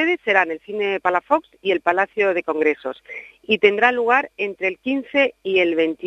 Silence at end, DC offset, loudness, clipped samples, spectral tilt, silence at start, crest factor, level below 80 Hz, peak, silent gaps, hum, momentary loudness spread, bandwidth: 0 s; under 0.1%; -19 LUFS; under 0.1%; -5 dB/octave; 0 s; 20 dB; -64 dBFS; 0 dBFS; none; none; 9 LU; 7.8 kHz